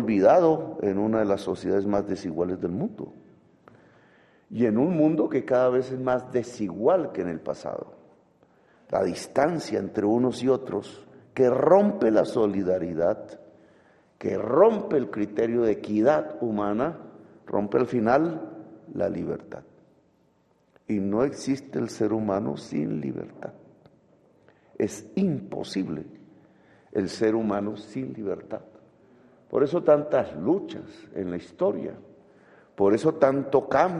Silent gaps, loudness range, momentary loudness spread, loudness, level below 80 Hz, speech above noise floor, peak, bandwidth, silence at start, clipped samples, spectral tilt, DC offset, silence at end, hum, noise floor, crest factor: none; 7 LU; 15 LU; -25 LUFS; -64 dBFS; 40 dB; -4 dBFS; 11.5 kHz; 0 s; under 0.1%; -7 dB/octave; under 0.1%; 0 s; none; -65 dBFS; 20 dB